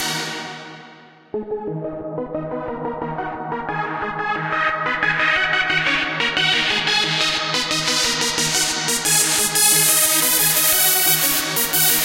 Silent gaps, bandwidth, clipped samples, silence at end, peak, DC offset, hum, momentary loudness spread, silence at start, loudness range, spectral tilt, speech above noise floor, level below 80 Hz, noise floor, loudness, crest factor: none; 16.5 kHz; under 0.1%; 0 s; 0 dBFS; under 0.1%; none; 14 LU; 0 s; 13 LU; -1 dB/octave; 18 dB; -50 dBFS; -45 dBFS; -17 LUFS; 20 dB